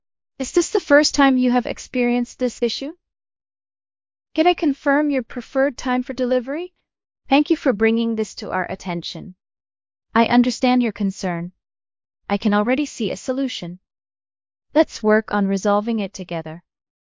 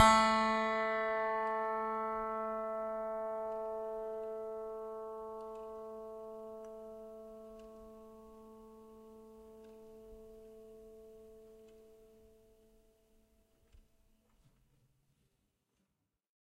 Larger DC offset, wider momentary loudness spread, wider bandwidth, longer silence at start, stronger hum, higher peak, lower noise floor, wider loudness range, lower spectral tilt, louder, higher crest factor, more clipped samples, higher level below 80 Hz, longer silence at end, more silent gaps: neither; second, 13 LU vs 23 LU; second, 7.6 kHz vs 15.5 kHz; first, 0.4 s vs 0 s; neither; first, -2 dBFS vs -12 dBFS; first, under -90 dBFS vs -84 dBFS; second, 4 LU vs 22 LU; first, -4.5 dB/octave vs -3 dB/octave; first, -20 LUFS vs -37 LUFS; second, 20 dB vs 28 dB; neither; first, -54 dBFS vs -66 dBFS; second, 0.5 s vs 2.7 s; neither